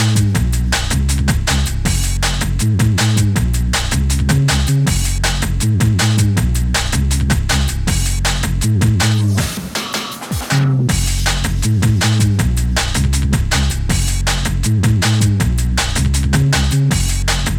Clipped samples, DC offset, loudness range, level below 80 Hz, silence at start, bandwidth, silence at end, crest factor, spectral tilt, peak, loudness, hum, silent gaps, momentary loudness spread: under 0.1%; under 0.1%; 1 LU; -20 dBFS; 0 s; 18.5 kHz; 0 s; 12 dB; -4.5 dB/octave; -2 dBFS; -16 LUFS; none; none; 4 LU